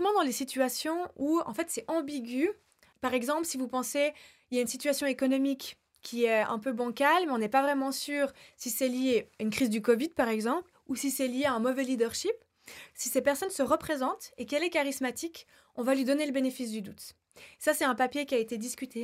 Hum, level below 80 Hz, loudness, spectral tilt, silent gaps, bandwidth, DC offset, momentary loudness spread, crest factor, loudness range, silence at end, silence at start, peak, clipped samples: none; -72 dBFS; -30 LUFS; -3 dB/octave; none; 16 kHz; under 0.1%; 11 LU; 18 dB; 3 LU; 0 s; 0 s; -12 dBFS; under 0.1%